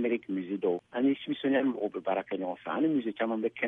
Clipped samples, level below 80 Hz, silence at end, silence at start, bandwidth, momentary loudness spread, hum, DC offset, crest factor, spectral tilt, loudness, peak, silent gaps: under 0.1%; -78 dBFS; 0 s; 0 s; 3.8 kHz; 6 LU; none; under 0.1%; 16 dB; -8.5 dB/octave; -31 LUFS; -14 dBFS; none